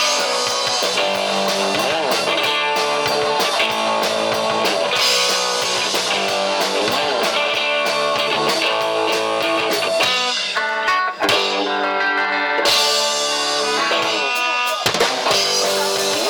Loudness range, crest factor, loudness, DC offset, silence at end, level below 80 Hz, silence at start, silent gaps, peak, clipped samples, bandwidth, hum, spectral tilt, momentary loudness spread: 1 LU; 10 dB; -17 LUFS; under 0.1%; 0 s; -60 dBFS; 0 s; none; -8 dBFS; under 0.1%; over 20 kHz; none; -1 dB/octave; 3 LU